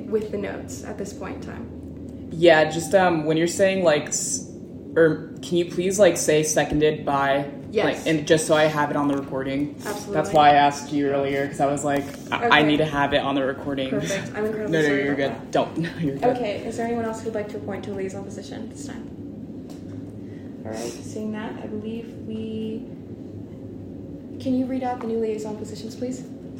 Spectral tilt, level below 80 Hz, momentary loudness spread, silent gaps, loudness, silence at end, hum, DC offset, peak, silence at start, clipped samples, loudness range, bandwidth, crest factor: -4.5 dB/octave; -52 dBFS; 18 LU; none; -23 LUFS; 0 s; none; under 0.1%; -2 dBFS; 0 s; under 0.1%; 13 LU; 16 kHz; 22 dB